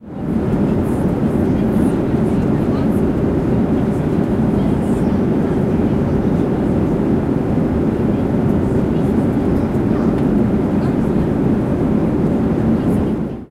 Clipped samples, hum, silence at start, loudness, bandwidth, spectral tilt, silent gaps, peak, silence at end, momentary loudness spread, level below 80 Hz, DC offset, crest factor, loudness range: under 0.1%; none; 0 s; -17 LUFS; 13 kHz; -9.5 dB/octave; none; -6 dBFS; 0.05 s; 1 LU; -30 dBFS; under 0.1%; 10 dB; 0 LU